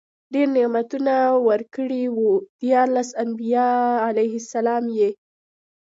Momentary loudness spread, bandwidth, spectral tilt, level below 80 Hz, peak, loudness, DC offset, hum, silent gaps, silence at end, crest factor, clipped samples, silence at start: 6 LU; 7.8 kHz; -5.5 dB/octave; -76 dBFS; -6 dBFS; -21 LUFS; under 0.1%; none; 2.49-2.59 s; 0.8 s; 16 dB; under 0.1%; 0.3 s